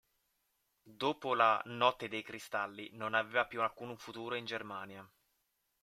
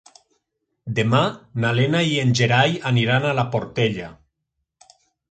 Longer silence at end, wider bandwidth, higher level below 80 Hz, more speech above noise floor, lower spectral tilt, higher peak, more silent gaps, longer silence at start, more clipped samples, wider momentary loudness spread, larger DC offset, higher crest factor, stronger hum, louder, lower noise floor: second, 0.75 s vs 1.2 s; first, 16 kHz vs 9.2 kHz; second, -80 dBFS vs -56 dBFS; second, 45 dB vs 58 dB; second, -4 dB/octave vs -5.5 dB/octave; second, -14 dBFS vs -4 dBFS; neither; about the same, 0.85 s vs 0.85 s; neither; first, 15 LU vs 9 LU; neither; first, 24 dB vs 18 dB; neither; second, -35 LUFS vs -20 LUFS; about the same, -81 dBFS vs -78 dBFS